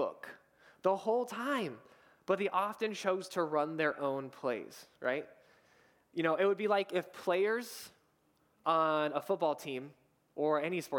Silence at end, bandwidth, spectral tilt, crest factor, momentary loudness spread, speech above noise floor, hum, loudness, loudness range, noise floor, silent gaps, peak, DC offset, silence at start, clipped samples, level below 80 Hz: 0 s; 19 kHz; -5 dB/octave; 20 dB; 16 LU; 39 dB; none; -34 LUFS; 2 LU; -73 dBFS; none; -16 dBFS; under 0.1%; 0 s; under 0.1%; -88 dBFS